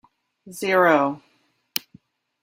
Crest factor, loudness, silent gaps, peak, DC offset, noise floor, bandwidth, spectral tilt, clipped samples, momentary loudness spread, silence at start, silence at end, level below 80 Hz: 24 dB; -21 LUFS; none; 0 dBFS; under 0.1%; -66 dBFS; 16 kHz; -4 dB/octave; under 0.1%; 19 LU; 0.45 s; 1.25 s; -72 dBFS